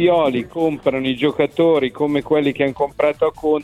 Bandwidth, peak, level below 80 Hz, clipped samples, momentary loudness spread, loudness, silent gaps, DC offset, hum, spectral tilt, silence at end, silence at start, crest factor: 12.5 kHz; -2 dBFS; -50 dBFS; under 0.1%; 4 LU; -18 LUFS; none; under 0.1%; none; -7 dB/octave; 0 s; 0 s; 16 dB